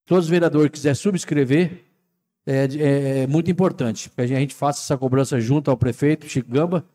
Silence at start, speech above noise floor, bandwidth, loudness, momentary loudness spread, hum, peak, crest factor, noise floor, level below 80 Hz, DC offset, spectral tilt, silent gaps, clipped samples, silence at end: 0.1 s; 53 dB; 14 kHz; -20 LUFS; 6 LU; none; -8 dBFS; 12 dB; -73 dBFS; -60 dBFS; under 0.1%; -6.5 dB/octave; none; under 0.1%; 0.15 s